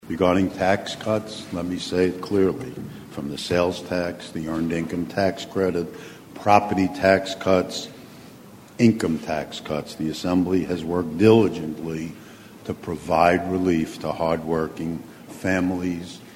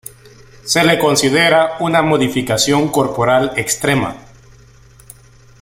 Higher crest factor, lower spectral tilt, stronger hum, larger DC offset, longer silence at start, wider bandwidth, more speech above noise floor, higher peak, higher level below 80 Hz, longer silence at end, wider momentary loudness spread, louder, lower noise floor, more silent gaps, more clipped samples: first, 22 dB vs 16 dB; first, -6 dB/octave vs -4 dB/octave; neither; neither; second, 0.05 s vs 0.65 s; about the same, 16.5 kHz vs 16.5 kHz; second, 22 dB vs 30 dB; about the same, 0 dBFS vs 0 dBFS; about the same, -52 dBFS vs -48 dBFS; second, 0 s vs 1.4 s; first, 15 LU vs 6 LU; second, -23 LUFS vs -14 LUFS; about the same, -45 dBFS vs -44 dBFS; neither; neither